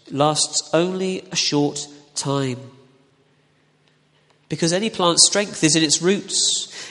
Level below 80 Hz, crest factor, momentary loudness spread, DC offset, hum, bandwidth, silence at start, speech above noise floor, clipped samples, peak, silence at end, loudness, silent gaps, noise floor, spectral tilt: -64 dBFS; 22 dB; 13 LU; under 0.1%; none; 11.5 kHz; 0.1 s; 40 dB; under 0.1%; 0 dBFS; 0 s; -19 LUFS; none; -60 dBFS; -3 dB/octave